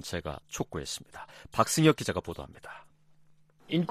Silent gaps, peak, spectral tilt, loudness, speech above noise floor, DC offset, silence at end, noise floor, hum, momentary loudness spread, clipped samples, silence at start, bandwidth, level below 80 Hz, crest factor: none; -8 dBFS; -4.5 dB/octave; -30 LUFS; 29 dB; under 0.1%; 0 s; -60 dBFS; none; 23 LU; under 0.1%; 0 s; 15 kHz; -56 dBFS; 24 dB